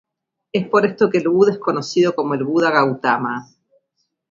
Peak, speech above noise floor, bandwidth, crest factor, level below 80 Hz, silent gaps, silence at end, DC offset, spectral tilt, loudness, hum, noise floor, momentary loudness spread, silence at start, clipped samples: 0 dBFS; 55 dB; 7.6 kHz; 18 dB; -64 dBFS; none; 0.9 s; under 0.1%; -6 dB/octave; -18 LUFS; none; -72 dBFS; 8 LU; 0.55 s; under 0.1%